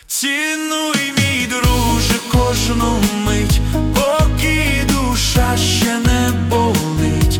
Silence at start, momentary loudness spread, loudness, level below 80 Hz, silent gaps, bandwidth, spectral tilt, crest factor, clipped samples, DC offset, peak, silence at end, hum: 0.1 s; 2 LU; -15 LUFS; -22 dBFS; none; 18 kHz; -4.5 dB/octave; 12 dB; under 0.1%; under 0.1%; -4 dBFS; 0 s; none